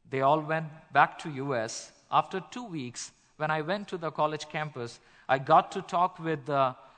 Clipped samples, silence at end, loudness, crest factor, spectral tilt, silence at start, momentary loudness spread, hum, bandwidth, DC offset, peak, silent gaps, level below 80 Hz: under 0.1%; 0.25 s; -29 LUFS; 22 dB; -5 dB/octave; 0.1 s; 15 LU; none; 9.4 kHz; under 0.1%; -8 dBFS; none; -70 dBFS